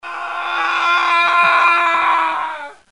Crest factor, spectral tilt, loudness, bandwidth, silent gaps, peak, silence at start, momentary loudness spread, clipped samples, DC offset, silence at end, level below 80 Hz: 16 dB; -1 dB/octave; -14 LUFS; 11 kHz; none; 0 dBFS; 0.05 s; 12 LU; under 0.1%; 0.3%; 0.2 s; -68 dBFS